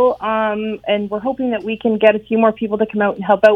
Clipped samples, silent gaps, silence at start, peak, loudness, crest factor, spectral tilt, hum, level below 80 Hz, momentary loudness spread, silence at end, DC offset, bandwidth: under 0.1%; none; 0 s; 0 dBFS; -17 LUFS; 16 dB; -7.5 dB/octave; none; -52 dBFS; 7 LU; 0 s; under 0.1%; 6.4 kHz